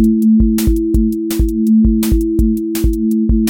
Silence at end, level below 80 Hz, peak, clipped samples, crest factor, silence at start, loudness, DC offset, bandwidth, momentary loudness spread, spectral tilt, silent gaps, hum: 0 s; -18 dBFS; -2 dBFS; under 0.1%; 10 dB; 0 s; -14 LUFS; under 0.1%; 17 kHz; 5 LU; -7 dB/octave; none; none